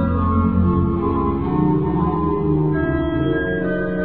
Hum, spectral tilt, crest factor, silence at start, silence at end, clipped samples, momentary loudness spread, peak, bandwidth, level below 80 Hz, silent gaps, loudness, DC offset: none; -12.5 dB/octave; 12 dB; 0 s; 0 s; under 0.1%; 3 LU; -6 dBFS; 4.2 kHz; -30 dBFS; none; -19 LUFS; 1%